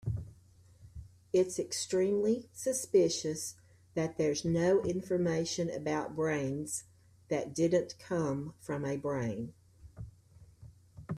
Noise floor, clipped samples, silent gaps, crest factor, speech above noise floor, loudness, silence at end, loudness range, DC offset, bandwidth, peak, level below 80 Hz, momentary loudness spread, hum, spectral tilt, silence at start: -60 dBFS; under 0.1%; none; 18 dB; 28 dB; -33 LUFS; 0 s; 4 LU; under 0.1%; 14.5 kHz; -16 dBFS; -60 dBFS; 20 LU; none; -5 dB/octave; 0.05 s